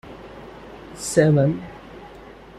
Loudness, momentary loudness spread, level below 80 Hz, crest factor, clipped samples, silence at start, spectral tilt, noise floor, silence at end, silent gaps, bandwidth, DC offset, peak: -20 LUFS; 24 LU; -50 dBFS; 20 dB; under 0.1%; 0.05 s; -6.5 dB/octave; -42 dBFS; 0.5 s; none; 13.5 kHz; under 0.1%; -2 dBFS